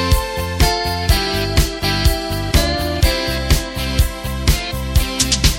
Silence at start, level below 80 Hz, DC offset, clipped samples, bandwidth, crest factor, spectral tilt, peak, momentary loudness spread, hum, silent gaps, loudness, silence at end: 0 s; -20 dBFS; under 0.1%; under 0.1%; 17 kHz; 16 dB; -4 dB/octave; 0 dBFS; 4 LU; none; none; -18 LUFS; 0 s